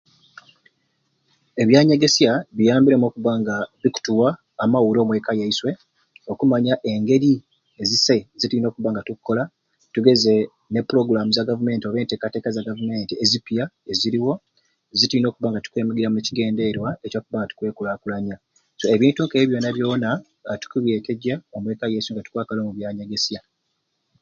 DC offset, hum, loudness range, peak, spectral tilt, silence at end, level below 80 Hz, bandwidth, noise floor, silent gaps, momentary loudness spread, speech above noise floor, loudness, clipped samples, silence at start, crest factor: under 0.1%; none; 6 LU; 0 dBFS; -5 dB/octave; 0.8 s; -60 dBFS; 7.6 kHz; -74 dBFS; none; 12 LU; 53 dB; -21 LUFS; under 0.1%; 1.55 s; 20 dB